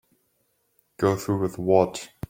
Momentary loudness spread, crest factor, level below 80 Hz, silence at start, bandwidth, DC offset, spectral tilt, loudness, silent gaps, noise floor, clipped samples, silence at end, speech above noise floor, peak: 6 LU; 20 dB; -58 dBFS; 1 s; 17 kHz; under 0.1%; -6.5 dB/octave; -24 LUFS; none; -71 dBFS; under 0.1%; 0.25 s; 48 dB; -6 dBFS